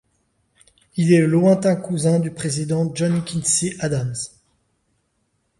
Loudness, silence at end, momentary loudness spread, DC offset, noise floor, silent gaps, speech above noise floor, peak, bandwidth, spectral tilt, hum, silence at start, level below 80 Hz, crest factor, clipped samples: -19 LUFS; 1.3 s; 10 LU; under 0.1%; -69 dBFS; none; 50 dB; -2 dBFS; 11.5 kHz; -5.5 dB/octave; none; 0.95 s; -56 dBFS; 18 dB; under 0.1%